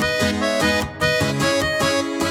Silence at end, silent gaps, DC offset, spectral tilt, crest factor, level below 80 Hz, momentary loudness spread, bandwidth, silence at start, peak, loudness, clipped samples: 0 s; none; under 0.1%; -4 dB/octave; 14 dB; -40 dBFS; 1 LU; 18 kHz; 0 s; -6 dBFS; -19 LUFS; under 0.1%